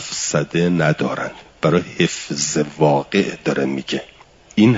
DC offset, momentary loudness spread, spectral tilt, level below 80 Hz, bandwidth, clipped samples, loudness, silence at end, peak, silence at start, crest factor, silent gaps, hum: under 0.1%; 8 LU; -5 dB/octave; -54 dBFS; 7.8 kHz; under 0.1%; -19 LUFS; 0 s; -2 dBFS; 0 s; 16 dB; none; none